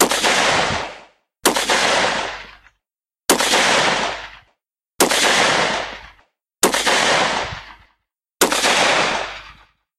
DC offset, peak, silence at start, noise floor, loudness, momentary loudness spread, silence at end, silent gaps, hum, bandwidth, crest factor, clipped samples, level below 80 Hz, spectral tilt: under 0.1%; -2 dBFS; 0 s; -87 dBFS; -16 LUFS; 16 LU; 0.45 s; none; none; 16 kHz; 18 dB; under 0.1%; -48 dBFS; -1 dB/octave